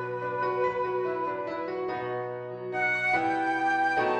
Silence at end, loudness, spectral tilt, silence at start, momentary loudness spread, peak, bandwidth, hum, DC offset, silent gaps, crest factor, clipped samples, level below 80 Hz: 0 s; -28 LUFS; -6 dB/octave; 0 s; 8 LU; -16 dBFS; 9.6 kHz; none; under 0.1%; none; 14 dB; under 0.1%; -68 dBFS